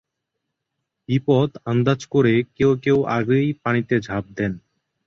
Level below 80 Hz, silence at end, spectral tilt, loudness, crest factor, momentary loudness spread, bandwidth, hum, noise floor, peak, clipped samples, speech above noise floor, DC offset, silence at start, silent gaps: -52 dBFS; 0.5 s; -7.5 dB/octave; -20 LUFS; 18 dB; 9 LU; 7.4 kHz; none; -79 dBFS; -4 dBFS; under 0.1%; 60 dB; under 0.1%; 1.1 s; none